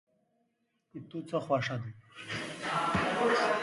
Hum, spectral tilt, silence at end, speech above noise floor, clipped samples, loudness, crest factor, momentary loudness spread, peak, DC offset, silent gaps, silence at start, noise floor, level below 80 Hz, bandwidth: none; -5 dB/octave; 0 s; 45 dB; under 0.1%; -32 LUFS; 18 dB; 18 LU; -16 dBFS; under 0.1%; none; 0.95 s; -78 dBFS; -60 dBFS; 11.5 kHz